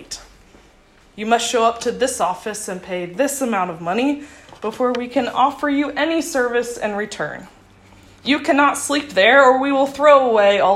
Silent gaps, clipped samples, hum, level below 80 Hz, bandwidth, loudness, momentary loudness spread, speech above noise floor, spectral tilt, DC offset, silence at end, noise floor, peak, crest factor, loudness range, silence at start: none; under 0.1%; none; -54 dBFS; 14.5 kHz; -18 LUFS; 15 LU; 33 dB; -3 dB/octave; under 0.1%; 0 s; -51 dBFS; 0 dBFS; 18 dB; 6 LU; 0 s